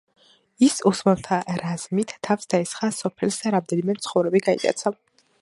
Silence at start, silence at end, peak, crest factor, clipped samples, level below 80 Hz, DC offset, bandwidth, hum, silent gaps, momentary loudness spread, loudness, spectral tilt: 0.6 s; 0.5 s; -4 dBFS; 20 dB; under 0.1%; -62 dBFS; under 0.1%; 11.5 kHz; none; none; 7 LU; -23 LUFS; -5 dB/octave